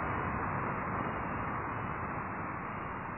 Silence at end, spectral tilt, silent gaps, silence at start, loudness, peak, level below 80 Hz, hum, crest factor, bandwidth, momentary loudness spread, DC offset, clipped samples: 0 s; -2.5 dB/octave; none; 0 s; -36 LUFS; -22 dBFS; -52 dBFS; none; 14 dB; 3.1 kHz; 4 LU; under 0.1%; under 0.1%